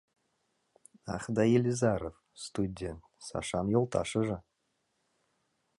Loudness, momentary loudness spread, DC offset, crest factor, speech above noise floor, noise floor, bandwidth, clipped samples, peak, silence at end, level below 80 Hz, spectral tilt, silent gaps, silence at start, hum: -32 LUFS; 16 LU; under 0.1%; 20 dB; 48 dB; -79 dBFS; 11.5 kHz; under 0.1%; -14 dBFS; 1.4 s; -56 dBFS; -6 dB/octave; none; 1.05 s; none